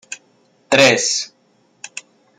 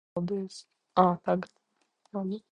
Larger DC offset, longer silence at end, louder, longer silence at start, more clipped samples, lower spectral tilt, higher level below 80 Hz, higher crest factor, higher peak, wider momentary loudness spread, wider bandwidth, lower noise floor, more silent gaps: neither; first, 0.4 s vs 0.15 s; first, -14 LUFS vs -30 LUFS; about the same, 0.1 s vs 0.15 s; neither; second, -2 dB/octave vs -7.5 dB/octave; about the same, -64 dBFS vs -66 dBFS; about the same, 20 dB vs 24 dB; first, 0 dBFS vs -8 dBFS; first, 23 LU vs 17 LU; first, 15 kHz vs 10.5 kHz; second, -58 dBFS vs -72 dBFS; neither